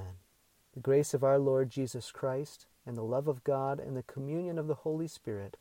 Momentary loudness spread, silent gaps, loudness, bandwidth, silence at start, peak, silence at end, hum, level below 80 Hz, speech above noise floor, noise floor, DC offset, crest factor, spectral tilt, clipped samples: 14 LU; none; -33 LUFS; 16.5 kHz; 0 s; -18 dBFS; 0.1 s; none; -70 dBFS; 37 dB; -69 dBFS; under 0.1%; 16 dB; -7 dB/octave; under 0.1%